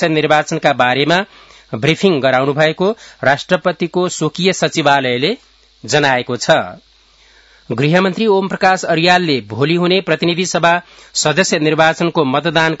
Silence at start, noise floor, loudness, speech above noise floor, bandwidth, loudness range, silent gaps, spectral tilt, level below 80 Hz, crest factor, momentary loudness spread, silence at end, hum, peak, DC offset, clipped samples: 0 s; -49 dBFS; -14 LUFS; 35 dB; 8.2 kHz; 2 LU; none; -4.5 dB/octave; -54 dBFS; 14 dB; 6 LU; 0.05 s; none; 0 dBFS; under 0.1%; under 0.1%